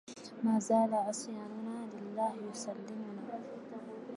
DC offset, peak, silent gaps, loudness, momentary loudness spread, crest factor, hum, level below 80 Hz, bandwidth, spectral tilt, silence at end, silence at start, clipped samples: under 0.1%; -18 dBFS; none; -37 LUFS; 16 LU; 18 dB; none; -86 dBFS; 11.5 kHz; -5.5 dB/octave; 0 s; 0.05 s; under 0.1%